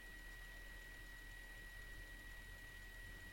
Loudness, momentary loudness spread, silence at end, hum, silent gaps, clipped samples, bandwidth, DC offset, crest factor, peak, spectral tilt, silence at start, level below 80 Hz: -55 LUFS; 1 LU; 0 s; none; none; under 0.1%; 16.5 kHz; under 0.1%; 12 dB; -42 dBFS; -3 dB/octave; 0 s; -58 dBFS